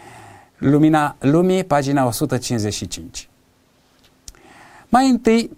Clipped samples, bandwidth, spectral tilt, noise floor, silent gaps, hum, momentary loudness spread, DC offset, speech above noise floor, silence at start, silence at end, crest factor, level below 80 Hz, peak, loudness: under 0.1%; 16 kHz; -6 dB/octave; -57 dBFS; none; none; 13 LU; under 0.1%; 41 dB; 0.15 s; 0.05 s; 18 dB; -46 dBFS; -2 dBFS; -18 LUFS